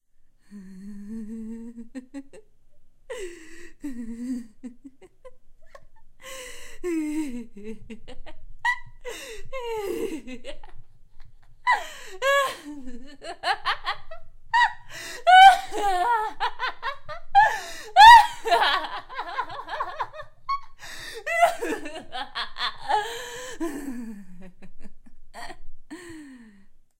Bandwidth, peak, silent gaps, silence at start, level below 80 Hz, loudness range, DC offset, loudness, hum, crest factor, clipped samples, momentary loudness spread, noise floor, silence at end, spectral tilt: 16 kHz; -2 dBFS; none; 0.5 s; -44 dBFS; 21 LU; under 0.1%; -21 LUFS; none; 22 dB; under 0.1%; 22 LU; -53 dBFS; 0.2 s; -2 dB/octave